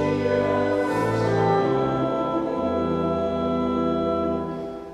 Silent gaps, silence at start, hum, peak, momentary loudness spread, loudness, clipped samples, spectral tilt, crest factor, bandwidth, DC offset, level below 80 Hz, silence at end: none; 0 s; none; -10 dBFS; 4 LU; -23 LUFS; under 0.1%; -7.5 dB/octave; 14 dB; 12.5 kHz; under 0.1%; -48 dBFS; 0 s